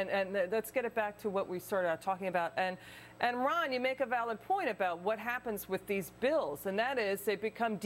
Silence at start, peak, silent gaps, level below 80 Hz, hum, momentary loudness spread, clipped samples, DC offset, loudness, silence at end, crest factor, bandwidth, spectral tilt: 0 s; -16 dBFS; none; -70 dBFS; none; 5 LU; under 0.1%; under 0.1%; -34 LUFS; 0 s; 18 dB; 16.5 kHz; -4.5 dB/octave